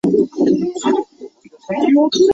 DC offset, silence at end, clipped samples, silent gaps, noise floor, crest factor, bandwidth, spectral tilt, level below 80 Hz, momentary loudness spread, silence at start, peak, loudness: under 0.1%; 0 s; under 0.1%; none; -38 dBFS; 12 dB; 8 kHz; -5.5 dB/octave; -58 dBFS; 10 LU; 0.05 s; -4 dBFS; -16 LUFS